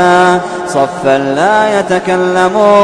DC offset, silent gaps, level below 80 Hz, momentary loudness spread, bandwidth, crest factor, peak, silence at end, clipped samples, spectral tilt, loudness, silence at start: under 0.1%; none; -48 dBFS; 6 LU; 11 kHz; 10 dB; 0 dBFS; 0 s; under 0.1%; -5 dB/octave; -10 LUFS; 0 s